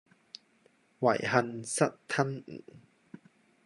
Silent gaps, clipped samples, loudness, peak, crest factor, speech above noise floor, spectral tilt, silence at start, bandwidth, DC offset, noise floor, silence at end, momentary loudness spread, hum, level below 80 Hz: none; under 0.1%; -30 LUFS; -10 dBFS; 24 dB; 37 dB; -4.5 dB/octave; 1 s; 11.5 kHz; under 0.1%; -67 dBFS; 0.85 s; 22 LU; none; -74 dBFS